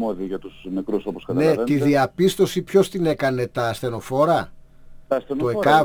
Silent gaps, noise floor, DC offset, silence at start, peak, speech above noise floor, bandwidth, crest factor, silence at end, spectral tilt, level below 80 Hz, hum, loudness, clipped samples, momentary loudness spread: none; -42 dBFS; under 0.1%; 0 s; -4 dBFS; 22 dB; over 20 kHz; 16 dB; 0 s; -6 dB/octave; -50 dBFS; none; -21 LUFS; under 0.1%; 10 LU